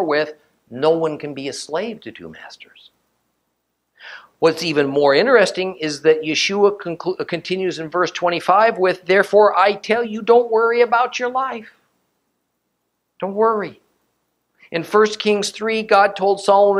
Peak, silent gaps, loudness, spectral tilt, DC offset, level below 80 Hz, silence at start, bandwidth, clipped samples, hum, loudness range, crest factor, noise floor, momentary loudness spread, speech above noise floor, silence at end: 0 dBFS; none; -17 LUFS; -4 dB/octave; under 0.1%; -68 dBFS; 0 s; 12.5 kHz; under 0.1%; none; 10 LU; 18 dB; -73 dBFS; 14 LU; 55 dB; 0 s